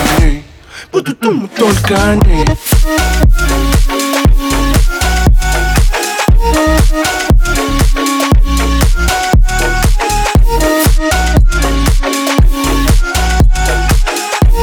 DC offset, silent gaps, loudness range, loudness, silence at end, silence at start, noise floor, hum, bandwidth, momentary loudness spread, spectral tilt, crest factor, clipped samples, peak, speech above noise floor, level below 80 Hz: under 0.1%; none; 1 LU; -11 LUFS; 0 s; 0 s; -32 dBFS; none; 19.5 kHz; 3 LU; -4.5 dB/octave; 8 dB; under 0.1%; 0 dBFS; 23 dB; -12 dBFS